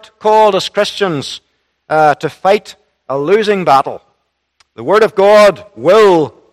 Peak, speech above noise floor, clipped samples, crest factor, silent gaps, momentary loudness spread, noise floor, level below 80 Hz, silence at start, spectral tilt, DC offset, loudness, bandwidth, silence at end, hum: 0 dBFS; 54 dB; 0.7%; 12 dB; none; 14 LU; -64 dBFS; -54 dBFS; 0.25 s; -5 dB/octave; under 0.1%; -11 LUFS; 14.5 kHz; 0.25 s; none